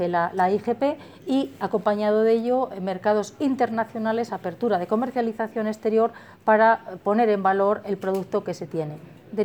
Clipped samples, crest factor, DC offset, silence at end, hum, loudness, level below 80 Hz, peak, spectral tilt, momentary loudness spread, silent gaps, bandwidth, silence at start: under 0.1%; 18 dB; under 0.1%; 0 s; none; -24 LUFS; -70 dBFS; -6 dBFS; -6.5 dB/octave; 8 LU; none; 19.5 kHz; 0 s